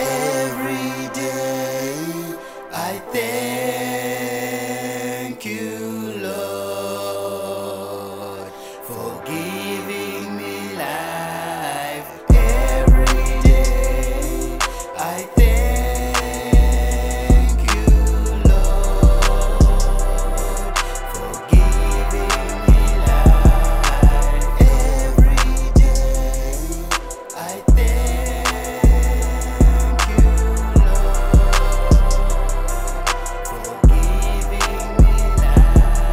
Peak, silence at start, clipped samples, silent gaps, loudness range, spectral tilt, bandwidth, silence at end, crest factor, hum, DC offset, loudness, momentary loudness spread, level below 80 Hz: -2 dBFS; 0 s; under 0.1%; none; 10 LU; -5.5 dB/octave; 16 kHz; 0 s; 14 dB; none; under 0.1%; -19 LUFS; 12 LU; -16 dBFS